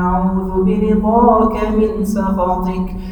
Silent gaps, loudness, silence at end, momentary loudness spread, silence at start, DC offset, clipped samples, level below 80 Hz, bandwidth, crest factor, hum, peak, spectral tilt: none; -15 LUFS; 0 s; 7 LU; 0 s; under 0.1%; under 0.1%; -28 dBFS; 17.5 kHz; 14 dB; none; 0 dBFS; -8.5 dB/octave